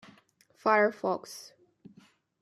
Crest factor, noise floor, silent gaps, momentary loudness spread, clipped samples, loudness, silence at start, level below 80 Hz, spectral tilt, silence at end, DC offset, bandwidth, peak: 22 dB; -63 dBFS; none; 20 LU; under 0.1%; -28 LUFS; 0.65 s; -84 dBFS; -4.5 dB/octave; 1 s; under 0.1%; 14 kHz; -10 dBFS